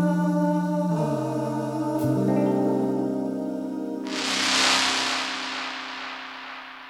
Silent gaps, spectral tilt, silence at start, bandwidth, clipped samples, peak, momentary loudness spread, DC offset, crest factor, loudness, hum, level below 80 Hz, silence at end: none; -4 dB/octave; 0 s; 16 kHz; under 0.1%; -4 dBFS; 13 LU; under 0.1%; 20 dB; -24 LUFS; none; -66 dBFS; 0 s